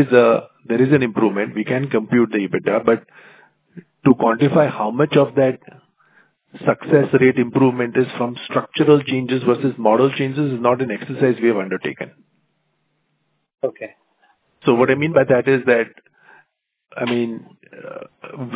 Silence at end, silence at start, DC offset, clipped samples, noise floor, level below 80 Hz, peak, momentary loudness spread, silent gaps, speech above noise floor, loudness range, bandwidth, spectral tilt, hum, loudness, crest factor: 0 s; 0 s; under 0.1%; under 0.1%; -69 dBFS; -62 dBFS; 0 dBFS; 13 LU; none; 52 dB; 6 LU; 4 kHz; -11 dB/octave; none; -18 LUFS; 18 dB